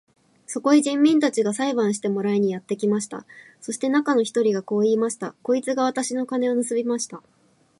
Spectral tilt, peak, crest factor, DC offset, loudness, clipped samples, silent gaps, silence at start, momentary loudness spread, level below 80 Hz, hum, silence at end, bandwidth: -4.5 dB/octave; -6 dBFS; 16 dB; under 0.1%; -22 LUFS; under 0.1%; none; 0.5 s; 12 LU; -74 dBFS; none; 0.6 s; 11.5 kHz